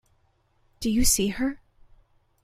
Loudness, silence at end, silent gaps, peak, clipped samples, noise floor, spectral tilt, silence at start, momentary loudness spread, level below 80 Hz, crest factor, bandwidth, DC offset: -24 LUFS; 0.9 s; none; -8 dBFS; under 0.1%; -66 dBFS; -3 dB/octave; 0.8 s; 11 LU; -38 dBFS; 20 dB; 16 kHz; under 0.1%